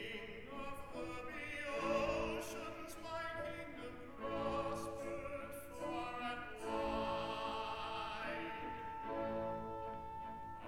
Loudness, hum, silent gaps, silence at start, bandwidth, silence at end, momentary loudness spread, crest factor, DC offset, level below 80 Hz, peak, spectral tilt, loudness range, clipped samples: -44 LUFS; none; none; 0 s; 18 kHz; 0 s; 9 LU; 18 dB; 0.1%; -60 dBFS; -24 dBFS; -4.5 dB/octave; 2 LU; under 0.1%